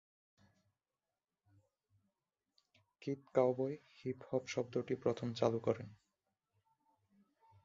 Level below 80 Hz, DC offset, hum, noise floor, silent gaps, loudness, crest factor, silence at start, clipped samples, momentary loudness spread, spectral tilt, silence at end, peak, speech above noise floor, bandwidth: -78 dBFS; under 0.1%; none; under -90 dBFS; none; -39 LUFS; 24 dB; 3 s; under 0.1%; 11 LU; -6 dB/octave; 1.7 s; -18 dBFS; over 52 dB; 7.6 kHz